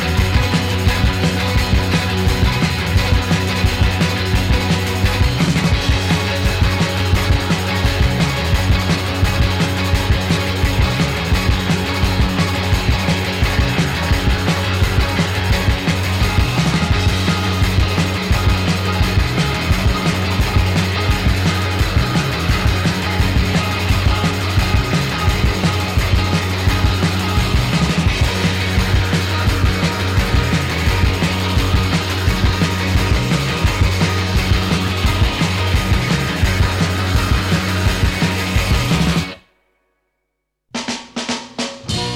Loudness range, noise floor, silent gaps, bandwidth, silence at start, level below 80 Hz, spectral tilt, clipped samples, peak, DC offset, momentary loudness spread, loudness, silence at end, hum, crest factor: 1 LU; -74 dBFS; none; 16.5 kHz; 0 s; -22 dBFS; -5 dB/octave; under 0.1%; -2 dBFS; under 0.1%; 2 LU; -17 LUFS; 0 s; none; 14 dB